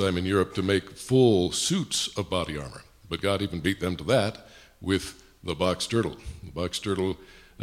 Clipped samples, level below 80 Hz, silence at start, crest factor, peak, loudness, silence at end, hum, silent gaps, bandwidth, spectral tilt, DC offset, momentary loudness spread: under 0.1%; -50 dBFS; 0 s; 20 dB; -8 dBFS; -27 LUFS; 0 s; none; none; 15.5 kHz; -4.5 dB/octave; under 0.1%; 16 LU